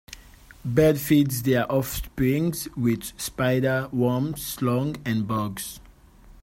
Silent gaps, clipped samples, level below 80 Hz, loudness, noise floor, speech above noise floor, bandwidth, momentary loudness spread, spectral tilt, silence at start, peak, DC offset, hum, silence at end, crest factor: none; under 0.1%; -46 dBFS; -24 LUFS; -50 dBFS; 26 dB; 16.5 kHz; 12 LU; -6 dB/octave; 0.1 s; -6 dBFS; under 0.1%; none; 0.1 s; 18 dB